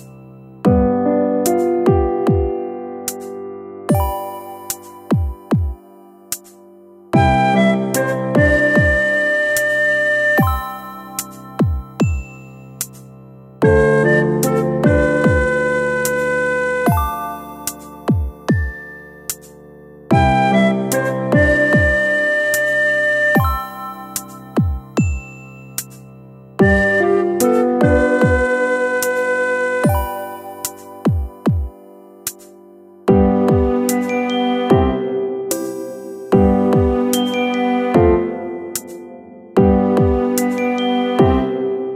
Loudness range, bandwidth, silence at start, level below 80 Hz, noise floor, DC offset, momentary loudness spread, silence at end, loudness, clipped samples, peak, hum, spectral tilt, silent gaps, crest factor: 7 LU; 16 kHz; 0 s; -30 dBFS; -43 dBFS; under 0.1%; 14 LU; 0 s; -16 LUFS; under 0.1%; 0 dBFS; none; -6 dB/octave; none; 16 dB